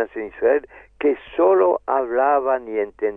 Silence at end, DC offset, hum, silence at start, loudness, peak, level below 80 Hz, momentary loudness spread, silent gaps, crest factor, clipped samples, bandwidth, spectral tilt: 0 s; under 0.1%; none; 0 s; -20 LUFS; -6 dBFS; -56 dBFS; 7 LU; none; 14 dB; under 0.1%; 3.7 kHz; -8 dB/octave